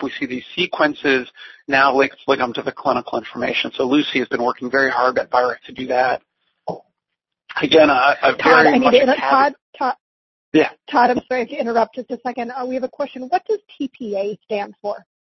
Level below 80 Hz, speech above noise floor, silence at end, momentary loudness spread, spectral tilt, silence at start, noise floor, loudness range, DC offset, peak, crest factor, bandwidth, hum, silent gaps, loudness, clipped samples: -60 dBFS; 63 dB; 0.35 s; 15 LU; -5 dB/octave; 0 s; -81 dBFS; 8 LU; under 0.1%; 0 dBFS; 18 dB; 6.2 kHz; none; 9.62-9.73 s, 10.00-10.52 s; -18 LUFS; under 0.1%